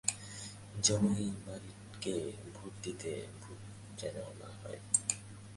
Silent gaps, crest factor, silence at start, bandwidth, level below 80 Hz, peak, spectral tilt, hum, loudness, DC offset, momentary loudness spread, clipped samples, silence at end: none; 26 dB; 0.05 s; 11.5 kHz; -62 dBFS; -12 dBFS; -3.5 dB/octave; none; -37 LUFS; under 0.1%; 17 LU; under 0.1%; 0 s